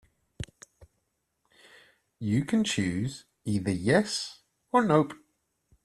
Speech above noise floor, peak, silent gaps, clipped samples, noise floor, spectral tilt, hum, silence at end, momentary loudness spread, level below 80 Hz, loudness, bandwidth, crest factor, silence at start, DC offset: 52 dB; -8 dBFS; none; under 0.1%; -78 dBFS; -5.5 dB/octave; none; 0.7 s; 18 LU; -60 dBFS; -28 LUFS; 13 kHz; 22 dB; 0.4 s; under 0.1%